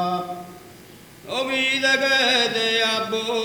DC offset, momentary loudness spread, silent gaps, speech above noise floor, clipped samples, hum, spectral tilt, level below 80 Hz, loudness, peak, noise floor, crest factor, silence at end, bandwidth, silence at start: under 0.1%; 15 LU; none; 23 dB; under 0.1%; none; -2 dB/octave; -64 dBFS; -20 LUFS; -6 dBFS; -45 dBFS; 18 dB; 0 s; over 20 kHz; 0 s